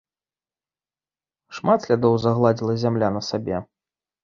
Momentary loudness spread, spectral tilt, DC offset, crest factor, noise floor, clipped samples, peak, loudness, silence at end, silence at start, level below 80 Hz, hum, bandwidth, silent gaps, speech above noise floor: 10 LU; -7 dB/octave; under 0.1%; 20 dB; under -90 dBFS; under 0.1%; -4 dBFS; -21 LUFS; 0.6 s; 1.5 s; -56 dBFS; none; 7.4 kHz; none; over 70 dB